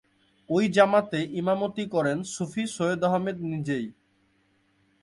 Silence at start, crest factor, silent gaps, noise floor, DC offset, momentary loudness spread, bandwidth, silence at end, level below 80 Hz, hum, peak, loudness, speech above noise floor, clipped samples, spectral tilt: 0.5 s; 20 dB; none; -67 dBFS; under 0.1%; 10 LU; 11.5 kHz; 1.1 s; -66 dBFS; none; -6 dBFS; -26 LUFS; 42 dB; under 0.1%; -5.5 dB/octave